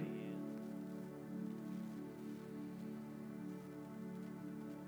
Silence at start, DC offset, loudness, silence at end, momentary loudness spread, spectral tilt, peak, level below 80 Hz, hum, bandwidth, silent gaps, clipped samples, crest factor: 0 s; under 0.1%; -49 LUFS; 0 s; 3 LU; -7.5 dB/octave; -32 dBFS; -78 dBFS; none; over 20 kHz; none; under 0.1%; 16 dB